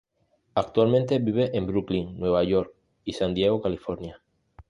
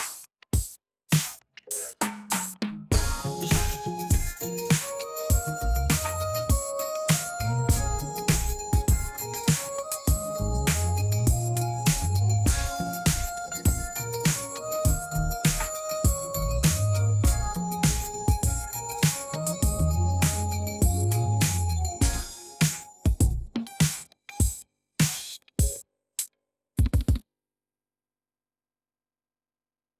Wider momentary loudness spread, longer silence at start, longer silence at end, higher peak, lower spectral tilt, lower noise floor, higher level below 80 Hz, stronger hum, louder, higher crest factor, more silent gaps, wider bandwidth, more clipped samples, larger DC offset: first, 14 LU vs 8 LU; first, 0.55 s vs 0 s; second, 0.1 s vs 2.8 s; first, -8 dBFS vs -14 dBFS; first, -7.5 dB/octave vs -4.5 dB/octave; second, -69 dBFS vs under -90 dBFS; second, -50 dBFS vs -32 dBFS; second, none vs 50 Hz at -45 dBFS; about the same, -25 LUFS vs -27 LUFS; about the same, 18 dB vs 14 dB; neither; second, 11 kHz vs 16 kHz; neither; neither